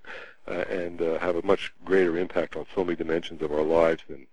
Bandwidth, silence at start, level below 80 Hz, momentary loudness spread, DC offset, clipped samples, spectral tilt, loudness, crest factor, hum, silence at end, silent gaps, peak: 10.5 kHz; 0 s; -54 dBFS; 10 LU; 1%; under 0.1%; -6.5 dB/octave; -27 LUFS; 18 dB; none; 0 s; none; -8 dBFS